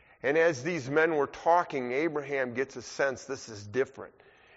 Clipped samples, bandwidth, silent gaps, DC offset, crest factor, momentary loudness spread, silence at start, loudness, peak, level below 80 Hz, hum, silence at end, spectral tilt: under 0.1%; 8 kHz; none; under 0.1%; 18 dB; 13 LU; 0.25 s; -29 LUFS; -12 dBFS; -70 dBFS; none; 0.5 s; -4 dB/octave